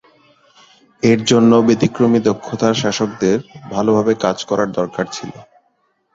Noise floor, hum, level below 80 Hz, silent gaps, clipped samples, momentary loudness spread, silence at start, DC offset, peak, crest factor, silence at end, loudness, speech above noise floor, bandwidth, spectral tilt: -63 dBFS; none; -54 dBFS; none; under 0.1%; 11 LU; 1.05 s; under 0.1%; 0 dBFS; 16 dB; 0.7 s; -16 LUFS; 48 dB; 7.8 kHz; -5.5 dB/octave